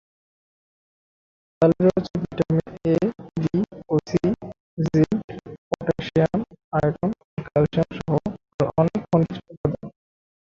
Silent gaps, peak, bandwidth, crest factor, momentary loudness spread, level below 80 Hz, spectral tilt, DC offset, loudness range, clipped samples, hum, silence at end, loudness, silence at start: 4.60-4.77 s, 5.24-5.28 s, 5.58-5.71 s, 6.64-6.71 s, 7.24-7.37 s, 8.54-8.59 s, 9.57-9.64 s; -4 dBFS; 7.4 kHz; 20 dB; 10 LU; -50 dBFS; -8.5 dB/octave; under 0.1%; 2 LU; under 0.1%; none; 0.6 s; -23 LUFS; 1.6 s